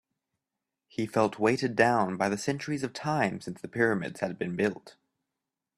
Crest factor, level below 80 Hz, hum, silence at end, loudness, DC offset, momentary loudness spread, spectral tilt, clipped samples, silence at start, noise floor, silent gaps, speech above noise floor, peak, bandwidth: 22 dB; -68 dBFS; none; 0.85 s; -29 LUFS; under 0.1%; 11 LU; -5.5 dB/octave; under 0.1%; 1 s; -88 dBFS; none; 59 dB; -8 dBFS; 13.5 kHz